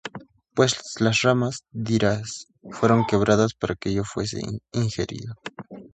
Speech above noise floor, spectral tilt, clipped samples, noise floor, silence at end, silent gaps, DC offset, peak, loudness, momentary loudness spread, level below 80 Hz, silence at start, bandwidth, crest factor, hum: 21 dB; -5 dB/octave; under 0.1%; -44 dBFS; 0.05 s; none; under 0.1%; -4 dBFS; -23 LUFS; 18 LU; -50 dBFS; 0.05 s; 9.2 kHz; 20 dB; none